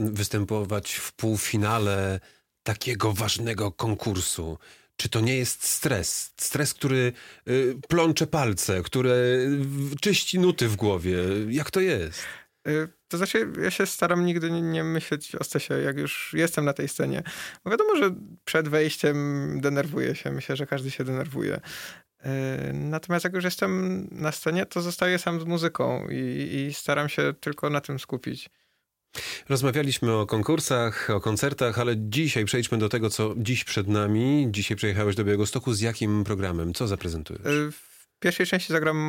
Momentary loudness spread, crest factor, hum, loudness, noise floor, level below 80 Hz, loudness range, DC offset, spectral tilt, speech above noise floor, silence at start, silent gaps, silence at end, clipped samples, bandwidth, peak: 8 LU; 18 dB; none; -26 LUFS; -74 dBFS; -54 dBFS; 4 LU; under 0.1%; -5 dB/octave; 48 dB; 0 s; none; 0 s; under 0.1%; 17 kHz; -8 dBFS